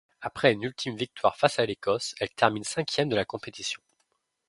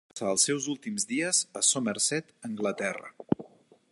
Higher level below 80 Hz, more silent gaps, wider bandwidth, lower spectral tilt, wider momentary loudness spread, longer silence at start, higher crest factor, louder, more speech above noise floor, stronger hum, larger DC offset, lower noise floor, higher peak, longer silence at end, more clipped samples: first, -64 dBFS vs -70 dBFS; neither; about the same, 11.5 kHz vs 12 kHz; first, -4 dB/octave vs -2 dB/octave; about the same, 10 LU vs 9 LU; about the same, 0.2 s vs 0.15 s; about the same, 26 dB vs 22 dB; about the same, -28 LUFS vs -28 LUFS; first, 48 dB vs 26 dB; neither; neither; first, -75 dBFS vs -56 dBFS; first, -4 dBFS vs -10 dBFS; first, 0.75 s vs 0.45 s; neither